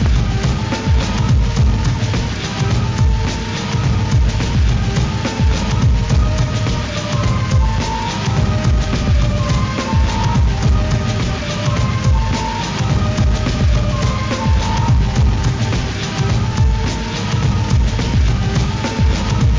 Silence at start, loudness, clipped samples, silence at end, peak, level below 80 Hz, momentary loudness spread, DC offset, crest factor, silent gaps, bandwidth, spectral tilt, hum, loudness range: 0 s; -17 LUFS; under 0.1%; 0 s; -4 dBFS; -18 dBFS; 4 LU; under 0.1%; 12 dB; none; 7.6 kHz; -6 dB/octave; none; 1 LU